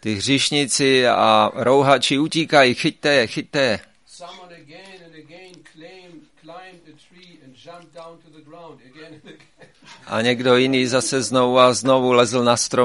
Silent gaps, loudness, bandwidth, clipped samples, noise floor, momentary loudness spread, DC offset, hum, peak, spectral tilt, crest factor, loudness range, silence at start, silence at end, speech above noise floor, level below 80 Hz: none; -17 LUFS; 11.5 kHz; under 0.1%; -49 dBFS; 7 LU; 0.1%; none; 0 dBFS; -3.5 dB/octave; 20 dB; 12 LU; 0.05 s; 0 s; 31 dB; -62 dBFS